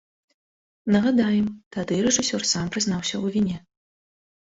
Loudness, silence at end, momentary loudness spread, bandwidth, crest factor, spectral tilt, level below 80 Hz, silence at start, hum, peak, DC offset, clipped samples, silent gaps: -23 LUFS; 0.9 s; 8 LU; 8 kHz; 18 dB; -4 dB/octave; -56 dBFS; 0.85 s; none; -8 dBFS; under 0.1%; under 0.1%; 1.66-1.71 s